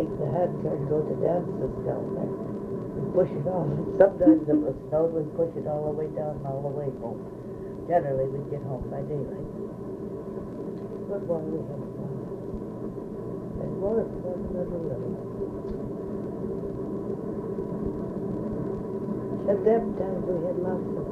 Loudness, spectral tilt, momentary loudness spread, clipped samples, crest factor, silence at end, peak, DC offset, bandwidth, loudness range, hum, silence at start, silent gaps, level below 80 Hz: -29 LUFS; -10.5 dB/octave; 11 LU; under 0.1%; 22 dB; 0 s; -6 dBFS; under 0.1%; 8.2 kHz; 9 LU; none; 0 s; none; -50 dBFS